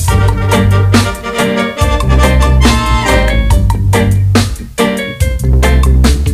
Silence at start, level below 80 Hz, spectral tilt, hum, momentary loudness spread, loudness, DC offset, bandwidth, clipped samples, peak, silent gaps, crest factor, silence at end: 0 s; -12 dBFS; -5.5 dB/octave; none; 5 LU; -11 LUFS; under 0.1%; 15.5 kHz; 0.3%; 0 dBFS; none; 10 dB; 0 s